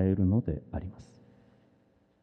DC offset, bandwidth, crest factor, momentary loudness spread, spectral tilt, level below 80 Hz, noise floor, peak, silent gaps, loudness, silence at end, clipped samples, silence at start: under 0.1%; 5.8 kHz; 18 dB; 20 LU; -11 dB/octave; -50 dBFS; -67 dBFS; -14 dBFS; none; -30 LUFS; 1.2 s; under 0.1%; 0 s